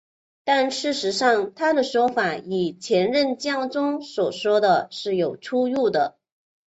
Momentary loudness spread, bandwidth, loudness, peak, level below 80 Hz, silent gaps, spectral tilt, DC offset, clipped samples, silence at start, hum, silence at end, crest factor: 6 LU; 8.2 kHz; -22 LUFS; -6 dBFS; -68 dBFS; none; -4 dB/octave; under 0.1%; under 0.1%; 0.45 s; none; 0.65 s; 16 dB